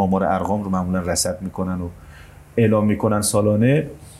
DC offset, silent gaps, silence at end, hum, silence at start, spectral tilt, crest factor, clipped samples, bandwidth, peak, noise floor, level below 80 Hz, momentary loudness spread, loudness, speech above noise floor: under 0.1%; none; 0 s; none; 0 s; -5.5 dB/octave; 16 dB; under 0.1%; 15 kHz; -4 dBFS; -42 dBFS; -46 dBFS; 9 LU; -20 LUFS; 23 dB